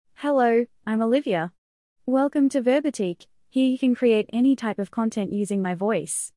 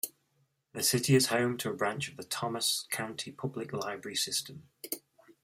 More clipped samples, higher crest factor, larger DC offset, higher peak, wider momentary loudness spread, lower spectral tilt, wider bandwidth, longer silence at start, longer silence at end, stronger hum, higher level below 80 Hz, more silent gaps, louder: neither; second, 14 dB vs 20 dB; neither; about the same, -10 dBFS vs -12 dBFS; second, 8 LU vs 15 LU; first, -5.5 dB/octave vs -3.5 dB/octave; second, 12 kHz vs 16 kHz; first, 0.2 s vs 0.05 s; second, 0.1 s vs 0.45 s; neither; about the same, -70 dBFS vs -72 dBFS; first, 1.58-1.96 s vs none; first, -23 LUFS vs -32 LUFS